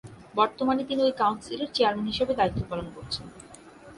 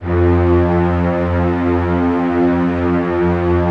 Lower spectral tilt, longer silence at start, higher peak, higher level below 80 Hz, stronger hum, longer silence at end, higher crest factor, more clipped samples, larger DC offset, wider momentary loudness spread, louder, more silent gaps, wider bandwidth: second, -5.5 dB/octave vs -10 dB/octave; about the same, 0.05 s vs 0 s; second, -8 dBFS vs -4 dBFS; second, -52 dBFS vs -36 dBFS; neither; about the same, 0 s vs 0 s; first, 20 dB vs 12 dB; neither; neither; first, 11 LU vs 3 LU; second, -27 LUFS vs -15 LUFS; neither; first, 11.5 kHz vs 5.8 kHz